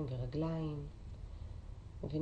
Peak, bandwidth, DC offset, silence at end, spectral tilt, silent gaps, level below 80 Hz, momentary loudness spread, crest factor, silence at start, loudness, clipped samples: -28 dBFS; 8.6 kHz; under 0.1%; 0 s; -9 dB/octave; none; -50 dBFS; 13 LU; 14 dB; 0 s; -43 LUFS; under 0.1%